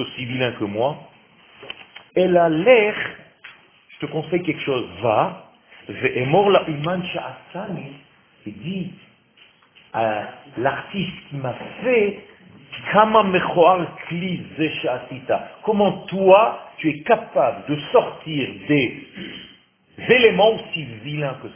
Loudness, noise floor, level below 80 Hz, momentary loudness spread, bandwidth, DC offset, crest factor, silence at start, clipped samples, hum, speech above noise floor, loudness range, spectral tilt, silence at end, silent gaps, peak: -20 LUFS; -54 dBFS; -58 dBFS; 19 LU; 3.6 kHz; under 0.1%; 20 dB; 0 s; under 0.1%; none; 34 dB; 8 LU; -9.5 dB/octave; 0.05 s; none; 0 dBFS